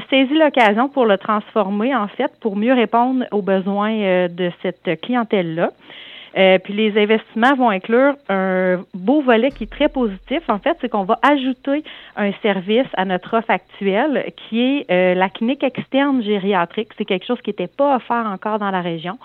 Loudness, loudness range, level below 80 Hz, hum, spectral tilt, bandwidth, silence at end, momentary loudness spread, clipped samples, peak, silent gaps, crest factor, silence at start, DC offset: -18 LUFS; 3 LU; -52 dBFS; none; -7.5 dB/octave; 7 kHz; 0.1 s; 8 LU; under 0.1%; 0 dBFS; none; 16 dB; 0 s; under 0.1%